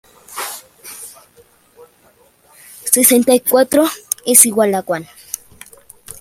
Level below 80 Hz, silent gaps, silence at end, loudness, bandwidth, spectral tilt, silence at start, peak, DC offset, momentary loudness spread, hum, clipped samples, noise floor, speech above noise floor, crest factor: -60 dBFS; none; 0.1 s; -12 LUFS; 16.5 kHz; -2.5 dB/octave; 0.3 s; 0 dBFS; under 0.1%; 23 LU; none; 0.1%; -52 dBFS; 39 dB; 18 dB